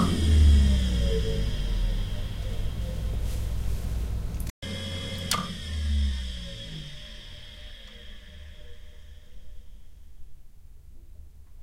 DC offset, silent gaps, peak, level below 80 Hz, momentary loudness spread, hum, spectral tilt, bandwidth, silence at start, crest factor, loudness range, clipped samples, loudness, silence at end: under 0.1%; 4.50-4.62 s; -10 dBFS; -30 dBFS; 24 LU; none; -5.5 dB/octave; 16 kHz; 0 s; 18 dB; 22 LU; under 0.1%; -28 LUFS; 0 s